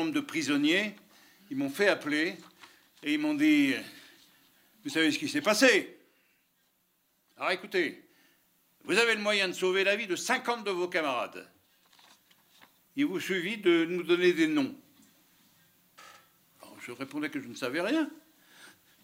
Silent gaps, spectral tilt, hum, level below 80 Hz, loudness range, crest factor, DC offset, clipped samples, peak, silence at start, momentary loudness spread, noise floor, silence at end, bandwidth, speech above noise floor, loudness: none; -3.5 dB/octave; none; -84 dBFS; 8 LU; 24 dB; under 0.1%; under 0.1%; -8 dBFS; 0 s; 14 LU; -73 dBFS; 0.35 s; 16 kHz; 44 dB; -28 LUFS